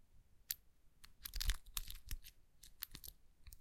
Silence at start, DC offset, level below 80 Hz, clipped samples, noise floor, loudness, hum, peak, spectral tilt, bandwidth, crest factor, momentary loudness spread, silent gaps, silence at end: 0 s; under 0.1%; -50 dBFS; under 0.1%; -65 dBFS; -48 LUFS; none; -20 dBFS; -1 dB/octave; 17 kHz; 30 dB; 21 LU; none; 0 s